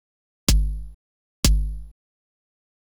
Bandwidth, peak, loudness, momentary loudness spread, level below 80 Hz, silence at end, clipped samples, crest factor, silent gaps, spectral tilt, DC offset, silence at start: over 20 kHz; -2 dBFS; -24 LUFS; 17 LU; -26 dBFS; 0.95 s; under 0.1%; 24 dB; 0.94-1.43 s; -3.5 dB/octave; under 0.1%; 0.5 s